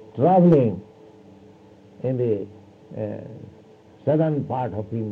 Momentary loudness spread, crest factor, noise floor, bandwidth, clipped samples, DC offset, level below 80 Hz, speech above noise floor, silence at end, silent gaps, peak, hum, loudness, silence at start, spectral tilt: 22 LU; 16 dB; -49 dBFS; 4.2 kHz; under 0.1%; under 0.1%; -62 dBFS; 28 dB; 0 s; none; -6 dBFS; none; -22 LUFS; 0 s; -11 dB/octave